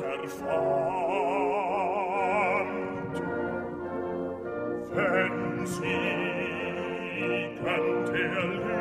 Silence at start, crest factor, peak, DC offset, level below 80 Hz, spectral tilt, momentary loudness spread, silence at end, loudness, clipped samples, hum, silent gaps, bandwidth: 0 s; 16 dB; -14 dBFS; under 0.1%; -60 dBFS; -6 dB/octave; 7 LU; 0 s; -29 LUFS; under 0.1%; none; none; 15.5 kHz